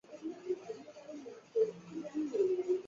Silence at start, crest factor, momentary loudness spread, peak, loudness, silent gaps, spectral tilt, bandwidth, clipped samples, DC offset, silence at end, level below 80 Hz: 0.1 s; 16 dB; 16 LU; -20 dBFS; -37 LUFS; none; -6.5 dB/octave; 7.4 kHz; under 0.1%; under 0.1%; 0 s; -82 dBFS